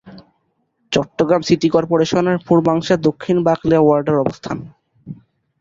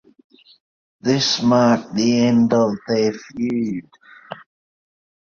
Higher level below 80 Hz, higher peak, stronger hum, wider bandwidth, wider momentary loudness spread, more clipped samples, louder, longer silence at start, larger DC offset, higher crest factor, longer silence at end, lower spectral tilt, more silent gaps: first, -50 dBFS vs -60 dBFS; about the same, -2 dBFS vs -2 dBFS; neither; about the same, 7.8 kHz vs 7.2 kHz; second, 14 LU vs 20 LU; neither; about the same, -16 LUFS vs -18 LUFS; second, 0.05 s vs 1.05 s; neither; about the same, 16 dB vs 18 dB; second, 0.45 s vs 0.95 s; first, -6.5 dB/octave vs -5 dB/octave; neither